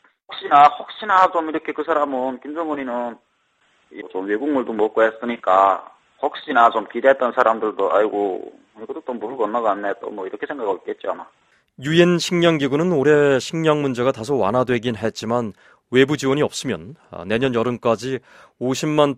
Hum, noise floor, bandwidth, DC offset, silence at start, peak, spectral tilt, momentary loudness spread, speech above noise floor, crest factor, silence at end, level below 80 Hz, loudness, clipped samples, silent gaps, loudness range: none; -63 dBFS; 14 kHz; under 0.1%; 0.3 s; 0 dBFS; -5.5 dB/octave; 14 LU; 44 dB; 20 dB; 0 s; -60 dBFS; -19 LUFS; under 0.1%; none; 6 LU